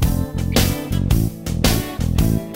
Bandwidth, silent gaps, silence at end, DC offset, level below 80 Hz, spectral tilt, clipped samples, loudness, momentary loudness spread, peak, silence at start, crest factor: 16.5 kHz; none; 0 s; 0.2%; -24 dBFS; -5 dB/octave; under 0.1%; -20 LUFS; 4 LU; -4 dBFS; 0 s; 14 dB